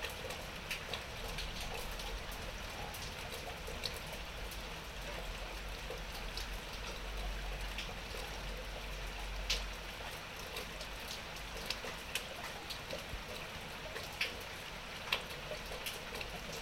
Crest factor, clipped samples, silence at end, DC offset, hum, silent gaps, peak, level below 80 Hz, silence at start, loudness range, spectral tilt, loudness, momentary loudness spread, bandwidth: 30 dB; under 0.1%; 0 s; under 0.1%; none; none; -14 dBFS; -48 dBFS; 0 s; 2 LU; -2.5 dB/octave; -43 LUFS; 6 LU; 16 kHz